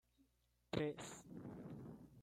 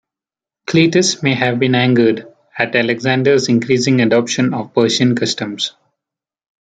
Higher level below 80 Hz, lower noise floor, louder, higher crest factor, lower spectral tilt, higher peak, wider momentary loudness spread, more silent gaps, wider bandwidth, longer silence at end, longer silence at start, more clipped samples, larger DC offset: second, -74 dBFS vs -58 dBFS; second, -80 dBFS vs -89 dBFS; second, -49 LUFS vs -15 LUFS; first, 26 dB vs 16 dB; about the same, -5.5 dB/octave vs -5 dB/octave; second, -24 dBFS vs 0 dBFS; first, 11 LU vs 8 LU; neither; first, 16 kHz vs 9.4 kHz; second, 0 s vs 1.1 s; second, 0.2 s vs 0.7 s; neither; neither